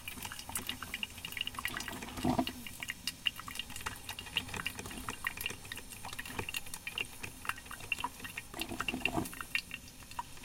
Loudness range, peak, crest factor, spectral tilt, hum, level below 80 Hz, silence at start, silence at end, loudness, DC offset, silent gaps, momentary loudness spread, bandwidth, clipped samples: 2 LU; -16 dBFS; 26 dB; -2.5 dB/octave; none; -56 dBFS; 0 s; 0 s; -39 LUFS; under 0.1%; none; 9 LU; 17 kHz; under 0.1%